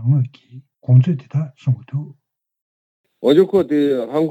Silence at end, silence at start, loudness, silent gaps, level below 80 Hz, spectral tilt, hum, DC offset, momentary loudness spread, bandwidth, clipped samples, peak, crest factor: 0 s; 0 s; -18 LUFS; 2.62-3.04 s; -64 dBFS; -9.5 dB/octave; none; under 0.1%; 14 LU; 8 kHz; under 0.1%; -2 dBFS; 16 dB